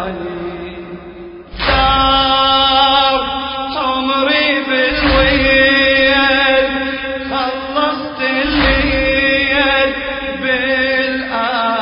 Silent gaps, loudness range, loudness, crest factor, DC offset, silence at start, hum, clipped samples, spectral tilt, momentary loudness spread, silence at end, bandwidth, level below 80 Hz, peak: none; 3 LU; -13 LUFS; 14 dB; under 0.1%; 0 s; none; under 0.1%; -8.5 dB/octave; 14 LU; 0 s; 5.4 kHz; -28 dBFS; 0 dBFS